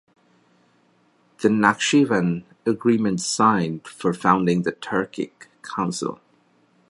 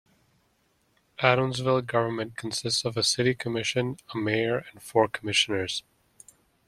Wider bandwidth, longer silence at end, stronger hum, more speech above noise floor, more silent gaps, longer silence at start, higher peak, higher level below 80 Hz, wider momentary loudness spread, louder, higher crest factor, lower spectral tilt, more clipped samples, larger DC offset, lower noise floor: second, 11.5 kHz vs 14 kHz; about the same, 0.75 s vs 0.85 s; neither; about the same, 40 dB vs 42 dB; neither; first, 1.4 s vs 1.2 s; about the same, -2 dBFS vs -4 dBFS; about the same, -62 dBFS vs -64 dBFS; first, 12 LU vs 9 LU; first, -22 LUFS vs -26 LUFS; about the same, 22 dB vs 24 dB; about the same, -5 dB/octave vs -4 dB/octave; neither; neither; second, -61 dBFS vs -69 dBFS